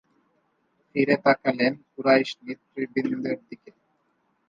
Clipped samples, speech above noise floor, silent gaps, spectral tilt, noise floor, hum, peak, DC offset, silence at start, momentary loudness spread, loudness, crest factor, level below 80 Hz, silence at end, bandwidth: under 0.1%; 46 dB; none; -6.5 dB/octave; -70 dBFS; none; -6 dBFS; under 0.1%; 0.95 s; 16 LU; -24 LUFS; 20 dB; -74 dBFS; 0.95 s; 7.4 kHz